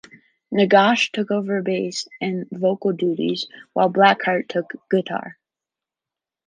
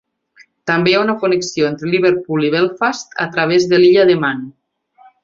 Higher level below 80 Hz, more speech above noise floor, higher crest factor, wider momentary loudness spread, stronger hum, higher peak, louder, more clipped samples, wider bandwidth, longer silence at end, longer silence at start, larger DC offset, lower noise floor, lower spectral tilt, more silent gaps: second, -72 dBFS vs -58 dBFS; first, 68 dB vs 36 dB; about the same, 20 dB vs 16 dB; about the same, 12 LU vs 10 LU; neither; about the same, -2 dBFS vs 0 dBFS; second, -20 LUFS vs -14 LUFS; neither; first, 9.6 kHz vs 7.6 kHz; first, 1.15 s vs 0.75 s; second, 0.5 s vs 0.65 s; neither; first, -88 dBFS vs -50 dBFS; about the same, -5 dB/octave vs -5 dB/octave; neither